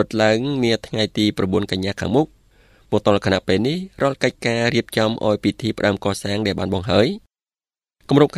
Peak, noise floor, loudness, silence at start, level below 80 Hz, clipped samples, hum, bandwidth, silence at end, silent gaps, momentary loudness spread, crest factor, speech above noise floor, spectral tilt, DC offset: 0 dBFS; under -90 dBFS; -20 LUFS; 0 s; -50 dBFS; under 0.1%; none; 14 kHz; 0 s; none; 5 LU; 20 dB; over 71 dB; -5.5 dB/octave; under 0.1%